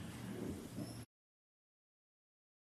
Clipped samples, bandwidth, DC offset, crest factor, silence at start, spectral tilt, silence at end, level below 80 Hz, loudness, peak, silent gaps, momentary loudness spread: under 0.1%; 14 kHz; under 0.1%; 18 dB; 0 s; -6 dB/octave; 1.7 s; -70 dBFS; -48 LUFS; -34 dBFS; none; 8 LU